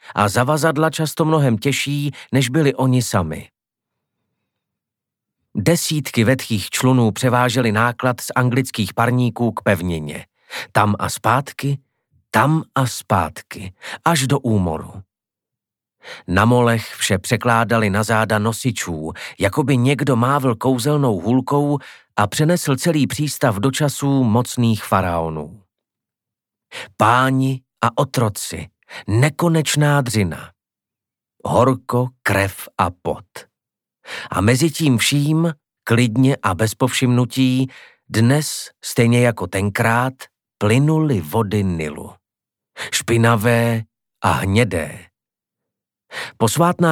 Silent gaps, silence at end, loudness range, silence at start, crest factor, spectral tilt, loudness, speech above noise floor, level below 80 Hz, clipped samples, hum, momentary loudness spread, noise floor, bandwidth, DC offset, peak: none; 0 s; 4 LU; 0.05 s; 18 dB; -5.5 dB/octave; -18 LUFS; 70 dB; -50 dBFS; under 0.1%; none; 11 LU; -87 dBFS; 18.5 kHz; under 0.1%; 0 dBFS